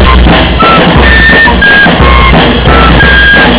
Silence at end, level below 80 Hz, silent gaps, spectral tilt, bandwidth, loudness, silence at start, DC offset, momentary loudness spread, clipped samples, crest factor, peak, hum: 0 s; -8 dBFS; none; -9 dB/octave; 4 kHz; -2 LUFS; 0 s; under 0.1%; 3 LU; 30%; 2 dB; 0 dBFS; none